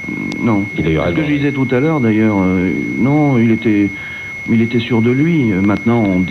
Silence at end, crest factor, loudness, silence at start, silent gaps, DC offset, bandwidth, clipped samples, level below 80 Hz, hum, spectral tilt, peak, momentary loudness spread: 0 s; 12 dB; -14 LUFS; 0 s; none; under 0.1%; 7.4 kHz; under 0.1%; -40 dBFS; none; -8 dB/octave; -2 dBFS; 4 LU